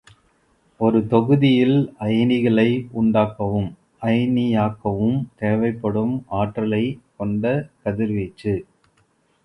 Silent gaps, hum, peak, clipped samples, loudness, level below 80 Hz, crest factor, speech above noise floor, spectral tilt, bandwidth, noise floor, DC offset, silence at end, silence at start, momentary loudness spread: none; none; -2 dBFS; under 0.1%; -21 LUFS; -50 dBFS; 18 dB; 43 dB; -9 dB/octave; 5.8 kHz; -62 dBFS; under 0.1%; 0.85 s; 0.8 s; 9 LU